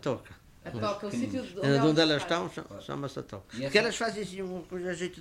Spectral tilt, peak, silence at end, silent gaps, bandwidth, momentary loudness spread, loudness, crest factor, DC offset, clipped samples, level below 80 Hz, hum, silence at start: -5 dB/octave; -10 dBFS; 0 s; none; 15.5 kHz; 16 LU; -30 LUFS; 20 dB; under 0.1%; under 0.1%; -60 dBFS; none; 0 s